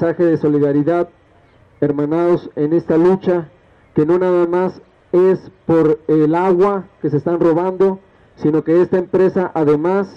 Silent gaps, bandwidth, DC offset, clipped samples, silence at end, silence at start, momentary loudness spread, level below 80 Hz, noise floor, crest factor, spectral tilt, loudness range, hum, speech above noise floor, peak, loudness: none; 6 kHz; under 0.1%; under 0.1%; 0.05 s; 0 s; 7 LU; -54 dBFS; -50 dBFS; 12 dB; -9.5 dB/octave; 2 LU; none; 35 dB; -4 dBFS; -16 LUFS